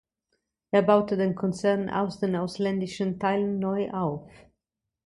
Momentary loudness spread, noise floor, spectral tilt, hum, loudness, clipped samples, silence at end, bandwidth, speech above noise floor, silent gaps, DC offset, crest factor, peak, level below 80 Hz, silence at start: 7 LU; -85 dBFS; -7 dB/octave; none; -26 LUFS; under 0.1%; 0.8 s; 11.5 kHz; 59 dB; none; under 0.1%; 20 dB; -8 dBFS; -62 dBFS; 0.75 s